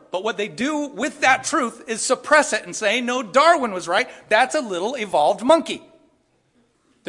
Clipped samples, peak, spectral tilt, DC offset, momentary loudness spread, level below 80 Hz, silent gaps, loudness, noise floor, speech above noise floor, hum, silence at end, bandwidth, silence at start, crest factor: under 0.1%; -2 dBFS; -2 dB/octave; under 0.1%; 9 LU; -66 dBFS; none; -20 LUFS; -63 dBFS; 43 dB; none; 1.3 s; 11.5 kHz; 0.15 s; 18 dB